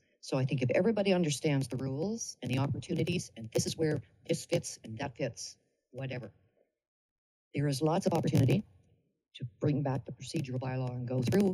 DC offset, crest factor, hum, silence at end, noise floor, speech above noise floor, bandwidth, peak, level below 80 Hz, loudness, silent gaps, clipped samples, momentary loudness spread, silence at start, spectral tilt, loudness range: under 0.1%; 18 dB; none; 0 s; -70 dBFS; 38 dB; 15.5 kHz; -16 dBFS; -66 dBFS; -33 LUFS; 6.88-7.51 s; under 0.1%; 12 LU; 0.25 s; -6 dB/octave; 7 LU